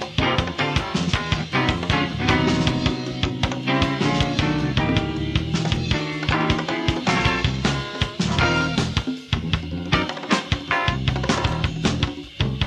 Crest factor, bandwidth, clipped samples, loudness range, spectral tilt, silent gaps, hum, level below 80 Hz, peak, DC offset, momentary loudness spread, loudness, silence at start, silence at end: 20 dB; 11 kHz; under 0.1%; 1 LU; -5 dB/octave; none; none; -34 dBFS; -2 dBFS; under 0.1%; 5 LU; -22 LUFS; 0 s; 0 s